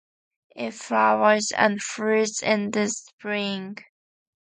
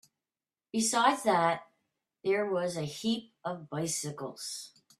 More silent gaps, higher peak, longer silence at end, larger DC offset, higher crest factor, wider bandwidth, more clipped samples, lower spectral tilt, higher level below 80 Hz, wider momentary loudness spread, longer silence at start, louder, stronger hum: first, 3.13-3.18 s vs none; first, -4 dBFS vs -10 dBFS; first, 0.6 s vs 0.3 s; neither; about the same, 22 dB vs 22 dB; second, 9.6 kHz vs 14.5 kHz; neither; about the same, -3.5 dB/octave vs -3.5 dB/octave; about the same, -72 dBFS vs -76 dBFS; about the same, 14 LU vs 14 LU; second, 0.55 s vs 0.75 s; first, -23 LUFS vs -31 LUFS; neither